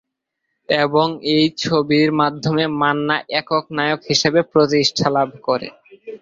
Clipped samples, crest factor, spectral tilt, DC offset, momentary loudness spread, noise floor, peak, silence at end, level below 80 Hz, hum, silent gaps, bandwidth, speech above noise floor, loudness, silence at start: under 0.1%; 16 dB; -4.5 dB/octave; under 0.1%; 6 LU; -76 dBFS; -2 dBFS; 0.05 s; -58 dBFS; none; none; 7.6 kHz; 59 dB; -17 LUFS; 0.7 s